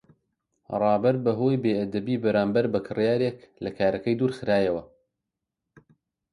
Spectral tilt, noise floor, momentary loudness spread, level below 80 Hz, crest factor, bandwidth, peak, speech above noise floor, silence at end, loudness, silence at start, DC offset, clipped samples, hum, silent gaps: -8.5 dB/octave; -85 dBFS; 7 LU; -60 dBFS; 16 dB; 11 kHz; -10 dBFS; 61 dB; 1.45 s; -25 LUFS; 0.7 s; under 0.1%; under 0.1%; none; none